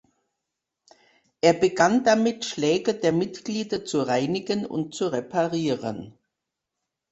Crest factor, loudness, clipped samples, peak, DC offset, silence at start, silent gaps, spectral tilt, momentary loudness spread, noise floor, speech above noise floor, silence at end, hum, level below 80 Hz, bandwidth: 22 dB; -24 LUFS; under 0.1%; -4 dBFS; under 0.1%; 1.45 s; none; -5 dB/octave; 9 LU; -84 dBFS; 61 dB; 1 s; none; -64 dBFS; 8.2 kHz